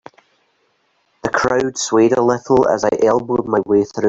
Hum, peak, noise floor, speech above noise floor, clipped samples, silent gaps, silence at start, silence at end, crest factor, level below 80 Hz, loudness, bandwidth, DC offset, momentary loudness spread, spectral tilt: none; -2 dBFS; -63 dBFS; 48 dB; under 0.1%; none; 1.25 s; 0 s; 14 dB; -50 dBFS; -16 LUFS; 8 kHz; under 0.1%; 4 LU; -5 dB/octave